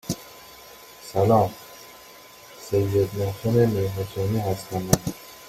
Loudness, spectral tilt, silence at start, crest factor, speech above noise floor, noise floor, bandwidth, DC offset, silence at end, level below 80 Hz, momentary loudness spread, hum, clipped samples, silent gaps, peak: -24 LUFS; -6 dB/octave; 0.05 s; 24 dB; 24 dB; -47 dBFS; 16.5 kHz; under 0.1%; 0 s; -50 dBFS; 23 LU; none; under 0.1%; none; -2 dBFS